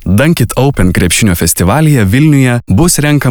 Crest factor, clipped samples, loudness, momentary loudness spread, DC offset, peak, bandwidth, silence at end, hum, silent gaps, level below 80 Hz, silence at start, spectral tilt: 8 dB; under 0.1%; -9 LUFS; 2 LU; under 0.1%; 0 dBFS; over 20 kHz; 0 s; none; none; -26 dBFS; 0 s; -5 dB/octave